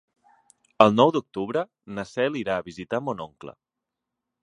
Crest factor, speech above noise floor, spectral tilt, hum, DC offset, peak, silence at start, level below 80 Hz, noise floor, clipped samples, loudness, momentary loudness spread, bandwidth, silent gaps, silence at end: 26 dB; 61 dB; -6 dB/octave; none; under 0.1%; 0 dBFS; 0.8 s; -64 dBFS; -85 dBFS; under 0.1%; -24 LUFS; 18 LU; 10.5 kHz; none; 0.95 s